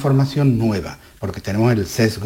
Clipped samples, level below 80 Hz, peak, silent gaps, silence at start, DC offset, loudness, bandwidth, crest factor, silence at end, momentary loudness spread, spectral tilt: under 0.1%; -44 dBFS; -4 dBFS; none; 0 s; under 0.1%; -19 LUFS; 16.5 kHz; 14 dB; 0 s; 13 LU; -7 dB/octave